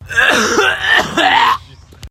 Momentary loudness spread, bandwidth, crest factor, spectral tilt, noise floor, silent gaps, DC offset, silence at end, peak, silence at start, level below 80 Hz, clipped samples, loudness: 3 LU; 16.5 kHz; 14 dB; -2 dB/octave; -36 dBFS; none; under 0.1%; 0 s; 0 dBFS; 0 s; -42 dBFS; under 0.1%; -11 LUFS